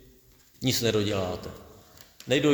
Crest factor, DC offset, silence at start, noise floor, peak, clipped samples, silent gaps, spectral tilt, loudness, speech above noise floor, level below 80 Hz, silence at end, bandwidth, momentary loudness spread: 18 dB; under 0.1%; 0.6 s; -58 dBFS; -10 dBFS; under 0.1%; none; -4.5 dB/octave; -27 LUFS; 32 dB; -56 dBFS; 0 s; over 20 kHz; 20 LU